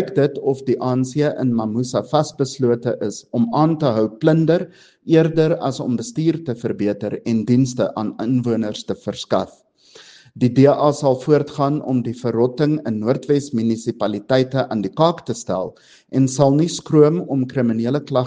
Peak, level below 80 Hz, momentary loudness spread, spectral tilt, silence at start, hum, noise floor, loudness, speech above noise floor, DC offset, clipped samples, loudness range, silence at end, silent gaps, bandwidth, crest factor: 0 dBFS; -58 dBFS; 9 LU; -7 dB/octave; 0 s; none; -46 dBFS; -19 LUFS; 28 dB; under 0.1%; under 0.1%; 3 LU; 0 s; none; 9.6 kHz; 18 dB